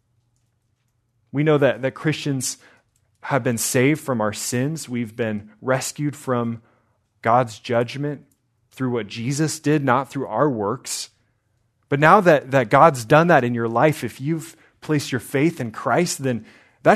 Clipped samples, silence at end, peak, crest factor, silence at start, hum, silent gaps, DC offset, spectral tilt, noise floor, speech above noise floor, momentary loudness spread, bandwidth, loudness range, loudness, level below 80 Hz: under 0.1%; 0 s; 0 dBFS; 22 dB; 1.35 s; none; none; under 0.1%; -5 dB/octave; -68 dBFS; 48 dB; 14 LU; 14 kHz; 7 LU; -21 LUFS; -64 dBFS